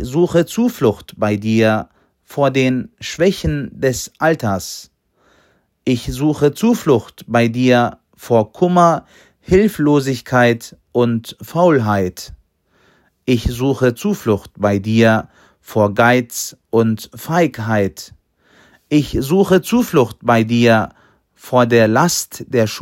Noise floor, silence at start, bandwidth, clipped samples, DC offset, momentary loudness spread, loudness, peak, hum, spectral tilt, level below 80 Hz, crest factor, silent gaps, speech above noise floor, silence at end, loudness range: -57 dBFS; 0 s; 16.5 kHz; under 0.1%; under 0.1%; 10 LU; -16 LUFS; 0 dBFS; none; -6 dB/octave; -40 dBFS; 16 dB; none; 42 dB; 0 s; 4 LU